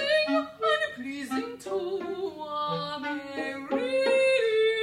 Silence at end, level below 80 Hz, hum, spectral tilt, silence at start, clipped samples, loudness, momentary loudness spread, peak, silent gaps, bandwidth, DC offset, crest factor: 0 s; -72 dBFS; none; -4 dB/octave; 0 s; under 0.1%; -28 LUFS; 11 LU; -12 dBFS; none; 14 kHz; under 0.1%; 14 dB